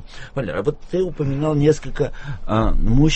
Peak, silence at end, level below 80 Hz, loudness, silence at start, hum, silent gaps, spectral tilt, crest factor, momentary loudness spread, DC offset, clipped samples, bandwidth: -2 dBFS; 0 s; -24 dBFS; -21 LUFS; 0 s; none; none; -7 dB/octave; 16 dB; 9 LU; under 0.1%; under 0.1%; 8.4 kHz